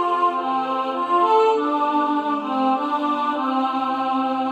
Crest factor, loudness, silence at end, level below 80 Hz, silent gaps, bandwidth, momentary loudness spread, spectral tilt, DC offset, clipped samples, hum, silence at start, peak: 14 dB; -21 LUFS; 0 s; -72 dBFS; none; 9.2 kHz; 5 LU; -5 dB/octave; under 0.1%; under 0.1%; none; 0 s; -6 dBFS